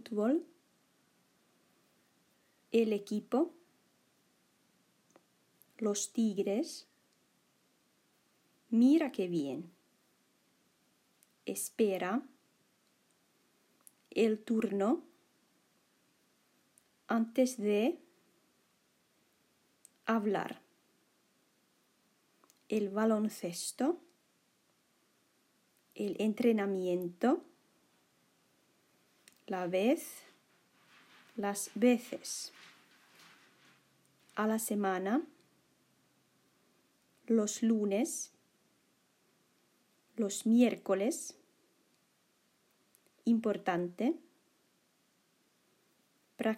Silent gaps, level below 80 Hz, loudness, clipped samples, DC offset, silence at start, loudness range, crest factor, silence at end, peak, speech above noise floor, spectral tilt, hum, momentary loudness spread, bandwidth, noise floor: none; under -90 dBFS; -34 LUFS; under 0.1%; under 0.1%; 0.05 s; 5 LU; 20 dB; 0 s; -16 dBFS; 42 dB; -5 dB/octave; none; 12 LU; 16 kHz; -74 dBFS